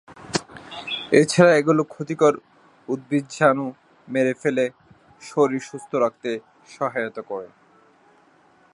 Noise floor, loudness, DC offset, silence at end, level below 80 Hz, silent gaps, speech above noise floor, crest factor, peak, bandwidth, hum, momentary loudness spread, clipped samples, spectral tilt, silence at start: -56 dBFS; -22 LUFS; under 0.1%; 1.25 s; -66 dBFS; none; 36 dB; 22 dB; 0 dBFS; 11.5 kHz; none; 17 LU; under 0.1%; -5.5 dB/octave; 0.1 s